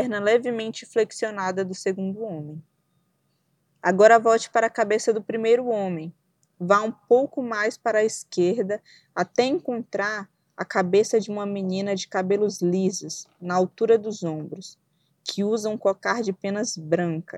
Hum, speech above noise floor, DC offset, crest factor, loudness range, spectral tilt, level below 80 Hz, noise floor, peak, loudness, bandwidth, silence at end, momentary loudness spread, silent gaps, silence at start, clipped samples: none; 47 dB; under 0.1%; 22 dB; 5 LU; -5 dB/octave; -76 dBFS; -70 dBFS; -2 dBFS; -24 LUFS; 12.5 kHz; 0 s; 13 LU; none; 0 s; under 0.1%